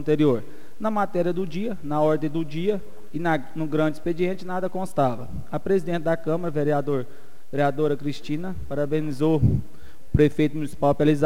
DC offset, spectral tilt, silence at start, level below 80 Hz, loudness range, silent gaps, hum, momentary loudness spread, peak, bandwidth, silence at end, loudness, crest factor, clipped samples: 4%; -8 dB/octave; 0 s; -44 dBFS; 2 LU; none; none; 9 LU; -6 dBFS; 16 kHz; 0 s; -25 LUFS; 18 dB; under 0.1%